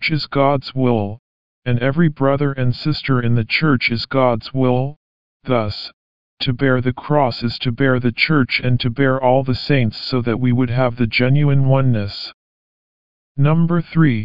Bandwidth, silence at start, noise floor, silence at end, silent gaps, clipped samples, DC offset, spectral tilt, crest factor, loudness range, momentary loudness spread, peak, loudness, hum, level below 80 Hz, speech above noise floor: 5.4 kHz; 0 s; under -90 dBFS; 0 s; 1.19-1.62 s, 4.96-5.40 s, 5.93-6.37 s, 12.34-13.35 s; under 0.1%; 3%; -9 dB/octave; 16 dB; 3 LU; 8 LU; -2 dBFS; -17 LUFS; none; -44 dBFS; over 74 dB